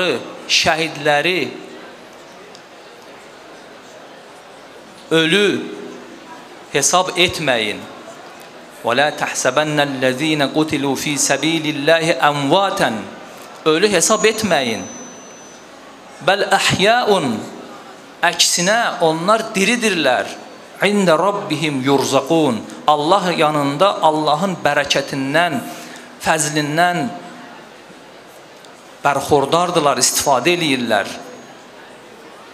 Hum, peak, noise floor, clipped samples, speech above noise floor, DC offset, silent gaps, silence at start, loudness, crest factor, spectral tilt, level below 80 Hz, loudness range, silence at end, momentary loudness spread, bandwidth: none; 0 dBFS; -40 dBFS; under 0.1%; 24 dB; under 0.1%; none; 0 s; -16 LUFS; 18 dB; -3 dB/octave; -58 dBFS; 5 LU; 0 s; 21 LU; 16 kHz